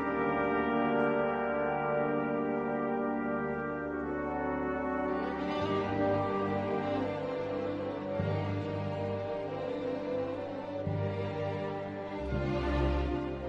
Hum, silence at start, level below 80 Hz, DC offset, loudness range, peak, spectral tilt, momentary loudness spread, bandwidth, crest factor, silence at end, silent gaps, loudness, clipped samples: none; 0 s; -46 dBFS; under 0.1%; 4 LU; -16 dBFS; -8.5 dB/octave; 6 LU; 7.8 kHz; 16 dB; 0 s; none; -33 LUFS; under 0.1%